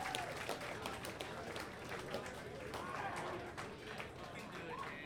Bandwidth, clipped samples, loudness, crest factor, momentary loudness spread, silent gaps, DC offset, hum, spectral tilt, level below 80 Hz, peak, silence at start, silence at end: 19 kHz; under 0.1%; -46 LUFS; 26 dB; 5 LU; none; under 0.1%; none; -4 dB/octave; -66 dBFS; -20 dBFS; 0 s; 0 s